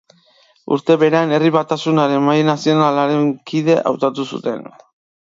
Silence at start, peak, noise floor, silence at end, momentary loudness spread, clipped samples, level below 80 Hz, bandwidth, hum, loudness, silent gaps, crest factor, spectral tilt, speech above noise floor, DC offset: 0.7 s; -2 dBFS; -54 dBFS; 0.55 s; 9 LU; under 0.1%; -66 dBFS; 7.8 kHz; none; -16 LUFS; none; 16 dB; -6.5 dB/octave; 39 dB; under 0.1%